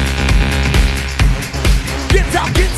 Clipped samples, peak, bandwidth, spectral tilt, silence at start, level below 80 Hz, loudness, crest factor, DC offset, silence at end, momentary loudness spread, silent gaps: under 0.1%; 0 dBFS; 13 kHz; -4.5 dB/octave; 0 s; -16 dBFS; -15 LUFS; 12 dB; under 0.1%; 0 s; 3 LU; none